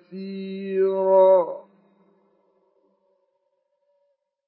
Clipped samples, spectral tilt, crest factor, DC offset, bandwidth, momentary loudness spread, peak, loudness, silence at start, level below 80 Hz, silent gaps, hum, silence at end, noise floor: under 0.1%; -11 dB/octave; 18 dB; under 0.1%; 4.5 kHz; 18 LU; -6 dBFS; -20 LUFS; 0.1 s; under -90 dBFS; none; none; 2.85 s; -73 dBFS